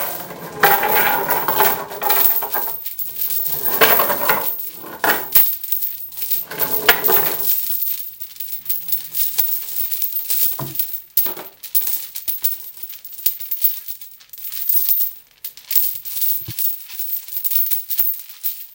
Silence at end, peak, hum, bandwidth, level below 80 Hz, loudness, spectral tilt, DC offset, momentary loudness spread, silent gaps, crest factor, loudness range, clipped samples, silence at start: 0 s; 0 dBFS; none; 18 kHz; -60 dBFS; -16 LUFS; -1.5 dB/octave; under 0.1%; 13 LU; none; 20 dB; 4 LU; under 0.1%; 0 s